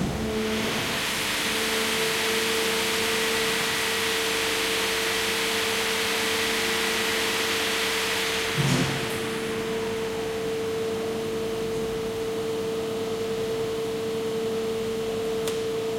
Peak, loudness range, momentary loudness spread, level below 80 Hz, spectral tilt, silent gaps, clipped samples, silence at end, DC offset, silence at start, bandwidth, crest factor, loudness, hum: -10 dBFS; 5 LU; 6 LU; -50 dBFS; -2.5 dB/octave; none; under 0.1%; 0 s; under 0.1%; 0 s; 16.5 kHz; 16 dB; -25 LUFS; none